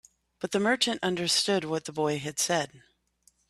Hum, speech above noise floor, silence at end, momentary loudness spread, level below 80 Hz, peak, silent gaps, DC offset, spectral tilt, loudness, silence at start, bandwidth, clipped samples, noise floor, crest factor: none; 39 dB; 0.7 s; 8 LU; -68 dBFS; -10 dBFS; none; under 0.1%; -3 dB/octave; -27 LUFS; 0.4 s; 14.5 kHz; under 0.1%; -67 dBFS; 20 dB